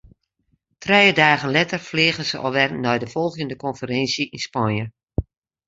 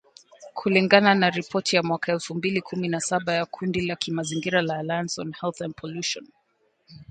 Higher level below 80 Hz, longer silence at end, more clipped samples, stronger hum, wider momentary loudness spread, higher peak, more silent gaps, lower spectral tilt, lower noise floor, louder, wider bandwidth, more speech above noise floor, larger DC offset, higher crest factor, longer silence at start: first, -44 dBFS vs -62 dBFS; first, 0.45 s vs 0.1 s; neither; neither; about the same, 14 LU vs 13 LU; about the same, -2 dBFS vs 0 dBFS; neither; about the same, -4.5 dB/octave vs -4.5 dB/octave; about the same, -69 dBFS vs -69 dBFS; first, -20 LUFS vs -24 LUFS; second, 8 kHz vs 9.4 kHz; first, 48 dB vs 44 dB; neither; about the same, 20 dB vs 24 dB; first, 0.8 s vs 0.4 s